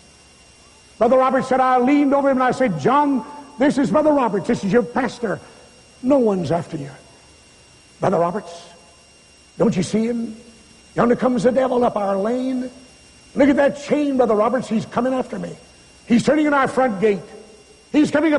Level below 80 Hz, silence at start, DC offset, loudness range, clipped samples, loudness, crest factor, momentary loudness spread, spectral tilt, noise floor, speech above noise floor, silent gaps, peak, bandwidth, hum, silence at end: -52 dBFS; 1 s; under 0.1%; 6 LU; under 0.1%; -19 LUFS; 16 dB; 12 LU; -6.5 dB/octave; -49 dBFS; 32 dB; none; -4 dBFS; 11.5 kHz; none; 0 s